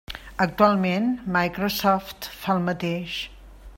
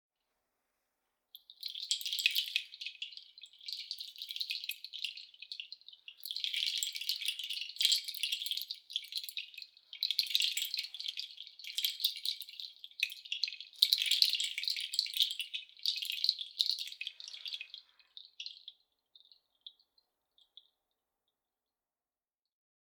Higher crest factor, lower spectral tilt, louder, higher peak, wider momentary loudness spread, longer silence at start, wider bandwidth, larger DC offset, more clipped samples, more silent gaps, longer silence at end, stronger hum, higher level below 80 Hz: second, 20 dB vs 34 dB; first, -5.5 dB/octave vs 8.5 dB/octave; first, -24 LUFS vs -34 LUFS; about the same, -4 dBFS vs -6 dBFS; second, 12 LU vs 19 LU; second, 0.1 s vs 1.35 s; second, 16.5 kHz vs over 20 kHz; neither; neither; neither; second, 0 s vs 3.2 s; neither; first, -48 dBFS vs under -90 dBFS